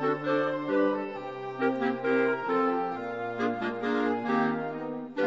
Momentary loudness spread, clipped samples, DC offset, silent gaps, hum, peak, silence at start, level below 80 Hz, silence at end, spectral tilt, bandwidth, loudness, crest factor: 8 LU; under 0.1%; under 0.1%; none; none; -14 dBFS; 0 s; -72 dBFS; 0 s; -7 dB/octave; 7.8 kHz; -29 LUFS; 14 dB